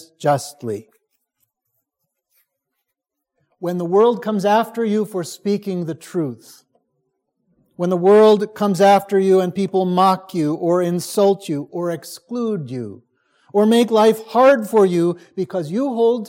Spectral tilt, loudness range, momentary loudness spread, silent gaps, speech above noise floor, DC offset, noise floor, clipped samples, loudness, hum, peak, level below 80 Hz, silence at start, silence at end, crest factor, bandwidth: -6 dB/octave; 10 LU; 13 LU; none; 63 dB; under 0.1%; -80 dBFS; under 0.1%; -17 LUFS; none; -2 dBFS; -72 dBFS; 0.2 s; 0 s; 16 dB; 16.5 kHz